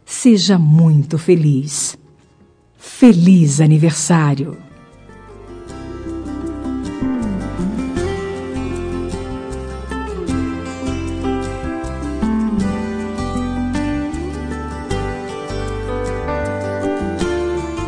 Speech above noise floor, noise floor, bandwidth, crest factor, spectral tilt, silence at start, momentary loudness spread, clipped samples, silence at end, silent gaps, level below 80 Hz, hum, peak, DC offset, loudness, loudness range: 39 dB; -50 dBFS; 10.5 kHz; 18 dB; -6 dB/octave; 0.1 s; 15 LU; under 0.1%; 0 s; none; -32 dBFS; none; 0 dBFS; under 0.1%; -18 LUFS; 10 LU